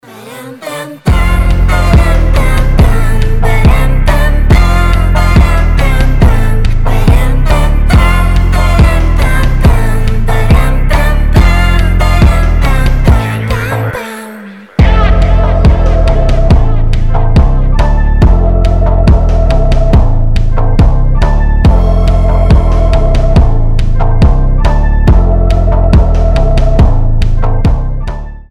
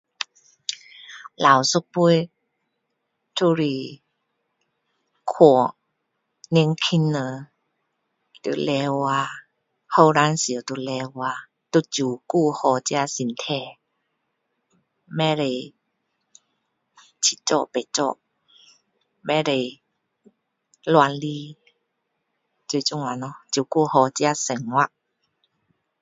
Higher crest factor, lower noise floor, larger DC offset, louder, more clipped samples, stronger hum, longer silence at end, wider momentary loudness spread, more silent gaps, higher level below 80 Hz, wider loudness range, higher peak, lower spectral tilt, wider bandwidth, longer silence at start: second, 6 dB vs 24 dB; second, -28 dBFS vs -76 dBFS; neither; first, -10 LUFS vs -22 LUFS; first, 1% vs under 0.1%; neither; second, 0.1 s vs 1.15 s; second, 5 LU vs 16 LU; neither; first, -8 dBFS vs -70 dBFS; second, 1 LU vs 6 LU; about the same, 0 dBFS vs 0 dBFS; first, -7 dB/octave vs -4.5 dB/octave; first, 13 kHz vs 8 kHz; about the same, 0.15 s vs 0.2 s